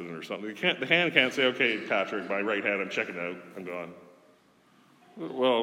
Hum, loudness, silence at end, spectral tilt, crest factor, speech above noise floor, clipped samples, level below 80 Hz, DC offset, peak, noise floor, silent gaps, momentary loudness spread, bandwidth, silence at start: none; -27 LUFS; 0 s; -4.5 dB/octave; 26 dB; 33 dB; under 0.1%; -88 dBFS; under 0.1%; -4 dBFS; -62 dBFS; none; 16 LU; 15.5 kHz; 0 s